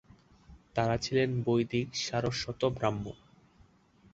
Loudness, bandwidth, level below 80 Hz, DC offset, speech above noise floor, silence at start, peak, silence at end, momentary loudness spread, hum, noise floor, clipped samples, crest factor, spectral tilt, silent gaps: -31 LUFS; 8 kHz; -56 dBFS; under 0.1%; 32 dB; 0.5 s; -14 dBFS; 1 s; 9 LU; none; -63 dBFS; under 0.1%; 20 dB; -5.5 dB/octave; none